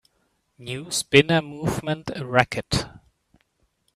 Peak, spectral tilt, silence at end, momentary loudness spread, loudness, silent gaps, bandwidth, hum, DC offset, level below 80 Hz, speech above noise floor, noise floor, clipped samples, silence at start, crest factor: 0 dBFS; -4.5 dB/octave; 1 s; 17 LU; -22 LUFS; none; 15 kHz; none; under 0.1%; -48 dBFS; 47 dB; -70 dBFS; under 0.1%; 0.6 s; 24 dB